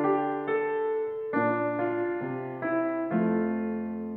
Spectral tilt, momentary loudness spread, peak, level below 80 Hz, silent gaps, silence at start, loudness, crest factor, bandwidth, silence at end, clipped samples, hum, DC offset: -10.5 dB/octave; 6 LU; -14 dBFS; -74 dBFS; none; 0 s; -29 LUFS; 14 dB; 4.2 kHz; 0 s; under 0.1%; none; under 0.1%